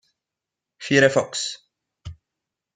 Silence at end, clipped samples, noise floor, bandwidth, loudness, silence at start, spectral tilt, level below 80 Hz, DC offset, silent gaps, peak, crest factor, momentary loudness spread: 0.65 s; under 0.1%; -86 dBFS; 9.6 kHz; -20 LUFS; 0.8 s; -4 dB/octave; -58 dBFS; under 0.1%; none; -2 dBFS; 24 dB; 25 LU